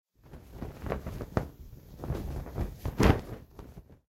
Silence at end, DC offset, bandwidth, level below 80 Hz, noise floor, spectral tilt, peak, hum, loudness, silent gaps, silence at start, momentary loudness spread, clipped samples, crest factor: 0.15 s; under 0.1%; 16 kHz; -40 dBFS; -51 dBFS; -7 dB/octave; -8 dBFS; none; -33 LUFS; none; 0.25 s; 25 LU; under 0.1%; 26 dB